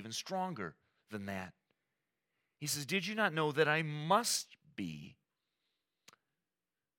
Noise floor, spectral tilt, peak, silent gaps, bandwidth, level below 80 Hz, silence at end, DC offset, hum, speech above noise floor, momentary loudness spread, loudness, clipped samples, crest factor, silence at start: under -90 dBFS; -3.5 dB/octave; -16 dBFS; none; 17.5 kHz; -84 dBFS; 1.85 s; under 0.1%; none; over 54 dB; 17 LU; -36 LUFS; under 0.1%; 22 dB; 0 s